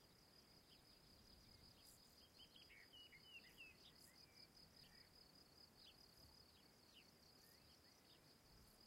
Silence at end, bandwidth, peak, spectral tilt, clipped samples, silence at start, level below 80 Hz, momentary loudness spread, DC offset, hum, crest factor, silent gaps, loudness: 0 s; 16 kHz; -52 dBFS; -2.5 dB/octave; under 0.1%; 0 s; -82 dBFS; 6 LU; under 0.1%; none; 16 dB; none; -66 LUFS